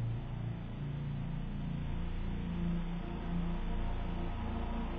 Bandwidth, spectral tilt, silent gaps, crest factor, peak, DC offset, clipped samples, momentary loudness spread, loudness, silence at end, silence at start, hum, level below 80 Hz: 4.8 kHz; -7.5 dB/octave; none; 12 dB; -24 dBFS; under 0.1%; under 0.1%; 3 LU; -40 LUFS; 0 s; 0 s; none; -40 dBFS